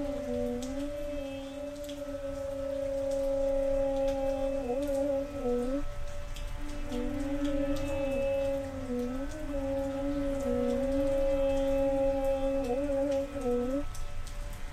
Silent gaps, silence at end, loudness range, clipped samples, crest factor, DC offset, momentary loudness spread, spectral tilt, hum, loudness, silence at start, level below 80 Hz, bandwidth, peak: none; 0 s; 4 LU; under 0.1%; 12 dB; under 0.1%; 11 LU; -6.5 dB/octave; none; -32 LUFS; 0 s; -40 dBFS; 15 kHz; -18 dBFS